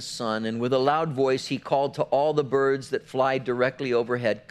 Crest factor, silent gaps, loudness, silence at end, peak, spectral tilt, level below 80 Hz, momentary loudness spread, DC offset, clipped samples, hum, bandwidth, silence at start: 16 dB; none; -25 LUFS; 0.1 s; -8 dBFS; -5.5 dB/octave; -66 dBFS; 5 LU; under 0.1%; under 0.1%; none; 12.5 kHz; 0 s